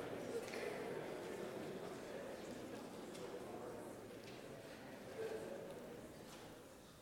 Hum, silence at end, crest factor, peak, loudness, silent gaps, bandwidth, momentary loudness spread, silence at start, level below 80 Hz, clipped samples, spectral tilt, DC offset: none; 0 s; 18 dB; -32 dBFS; -50 LUFS; none; 18 kHz; 9 LU; 0 s; -76 dBFS; under 0.1%; -4.5 dB/octave; under 0.1%